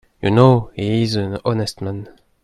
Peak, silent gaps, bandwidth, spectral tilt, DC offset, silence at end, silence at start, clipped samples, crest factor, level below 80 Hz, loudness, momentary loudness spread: 0 dBFS; none; 12 kHz; -7 dB/octave; under 0.1%; 0.35 s; 0.25 s; under 0.1%; 18 dB; -46 dBFS; -18 LUFS; 15 LU